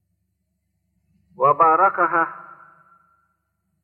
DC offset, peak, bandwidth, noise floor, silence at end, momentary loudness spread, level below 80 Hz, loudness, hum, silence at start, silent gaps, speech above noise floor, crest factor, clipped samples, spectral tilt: under 0.1%; -4 dBFS; 3.7 kHz; -73 dBFS; 1.4 s; 11 LU; -76 dBFS; -18 LUFS; none; 1.4 s; none; 56 dB; 18 dB; under 0.1%; -9.5 dB/octave